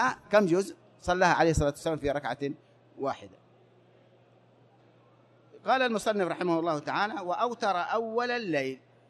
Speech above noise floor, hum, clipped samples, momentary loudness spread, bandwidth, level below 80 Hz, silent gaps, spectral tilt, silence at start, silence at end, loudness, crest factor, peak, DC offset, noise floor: 32 dB; none; under 0.1%; 12 LU; 13 kHz; -50 dBFS; none; -5 dB/octave; 0 s; 0.3 s; -29 LUFS; 20 dB; -10 dBFS; under 0.1%; -61 dBFS